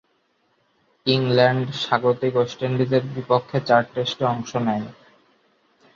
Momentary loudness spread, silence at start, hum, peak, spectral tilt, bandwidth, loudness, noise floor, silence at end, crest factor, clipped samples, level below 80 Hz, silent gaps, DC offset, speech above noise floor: 7 LU; 1.05 s; none; -2 dBFS; -6.5 dB/octave; 7.4 kHz; -21 LUFS; -66 dBFS; 1.05 s; 20 dB; under 0.1%; -62 dBFS; none; under 0.1%; 46 dB